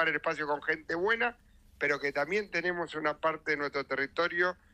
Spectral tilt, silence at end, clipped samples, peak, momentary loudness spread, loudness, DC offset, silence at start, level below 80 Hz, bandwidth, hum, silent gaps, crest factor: -4.5 dB/octave; 0.2 s; under 0.1%; -14 dBFS; 4 LU; -31 LUFS; under 0.1%; 0 s; -64 dBFS; 12 kHz; none; none; 18 dB